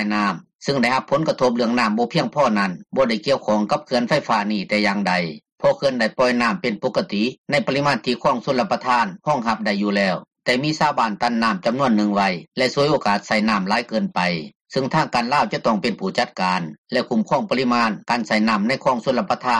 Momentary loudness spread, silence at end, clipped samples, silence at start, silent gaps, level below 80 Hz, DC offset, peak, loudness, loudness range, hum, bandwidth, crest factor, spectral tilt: 4 LU; 0 s; under 0.1%; 0 s; 0.55-0.59 s, 5.52-5.56 s, 7.38-7.44 s, 14.55-14.65 s, 16.78-16.84 s; -58 dBFS; under 0.1%; -6 dBFS; -20 LUFS; 1 LU; none; 11 kHz; 14 dB; -5.5 dB/octave